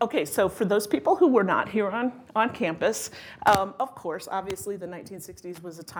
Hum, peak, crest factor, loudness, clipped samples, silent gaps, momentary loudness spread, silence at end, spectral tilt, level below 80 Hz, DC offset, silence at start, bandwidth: none; -4 dBFS; 22 dB; -25 LUFS; under 0.1%; none; 18 LU; 0 s; -4.5 dB/octave; -62 dBFS; under 0.1%; 0 s; 20 kHz